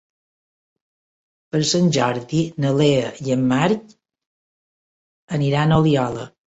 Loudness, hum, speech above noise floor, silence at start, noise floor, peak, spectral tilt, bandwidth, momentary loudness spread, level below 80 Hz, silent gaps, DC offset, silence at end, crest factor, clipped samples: -19 LUFS; none; over 72 dB; 1.55 s; under -90 dBFS; -4 dBFS; -6 dB/octave; 8.2 kHz; 8 LU; -50 dBFS; 4.26-5.28 s; under 0.1%; 0.2 s; 18 dB; under 0.1%